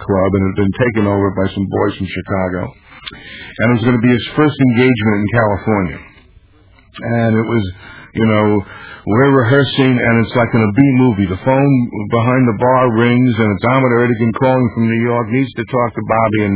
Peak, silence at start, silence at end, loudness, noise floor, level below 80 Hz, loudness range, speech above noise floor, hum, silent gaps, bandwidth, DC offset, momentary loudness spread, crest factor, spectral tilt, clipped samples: 0 dBFS; 0 s; 0 s; -14 LUFS; -46 dBFS; -38 dBFS; 5 LU; 33 dB; none; none; 4 kHz; under 0.1%; 11 LU; 14 dB; -11.5 dB/octave; under 0.1%